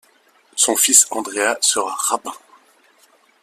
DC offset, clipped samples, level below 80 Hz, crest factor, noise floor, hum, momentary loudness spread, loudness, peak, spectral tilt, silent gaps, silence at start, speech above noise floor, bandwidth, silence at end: under 0.1%; under 0.1%; -70 dBFS; 20 dB; -56 dBFS; none; 14 LU; -15 LUFS; 0 dBFS; 1 dB/octave; none; 0.55 s; 38 dB; 16 kHz; 1.05 s